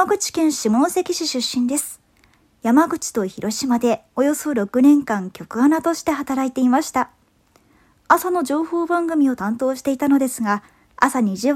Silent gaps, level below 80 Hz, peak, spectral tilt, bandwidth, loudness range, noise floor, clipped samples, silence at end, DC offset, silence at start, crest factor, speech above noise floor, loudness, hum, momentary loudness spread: none; -58 dBFS; 0 dBFS; -4 dB/octave; 16 kHz; 2 LU; -58 dBFS; under 0.1%; 0 s; under 0.1%; 0 s; 20 dB; 39 dB; -19 LUFS; none; 7 LU